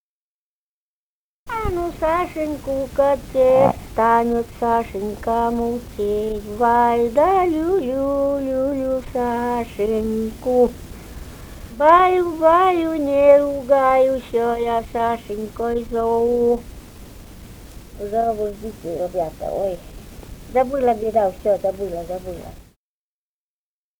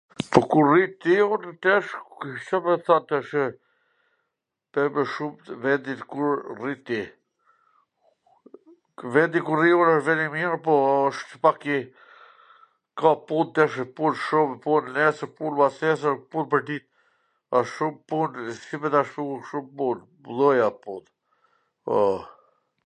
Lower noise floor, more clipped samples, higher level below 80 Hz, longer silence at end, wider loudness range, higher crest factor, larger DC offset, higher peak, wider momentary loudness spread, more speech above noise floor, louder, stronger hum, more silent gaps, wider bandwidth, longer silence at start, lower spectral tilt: first, under -90 dBFS vs -82 dBFS; neither; first, -40 dBFS vs -68 dBFS; first, 1.4 s vs 0.6 s; about the same, 8 LU vs 7 LU; about the same, 20 dB vs 24 dB; neither; about the same, 0 dBFS vs 0 dBFS; about the same, 15 LU vs 14 LU; first, over 71 dB vs 59 dB; first, -19 LUFS vs -24 LUFS; neither; neither; first, over 20 kHz vs 10 kHz; first, 1.45 s vs 0.2 s; about the same, -6.5 dB/octave vs -6.5 dB/octave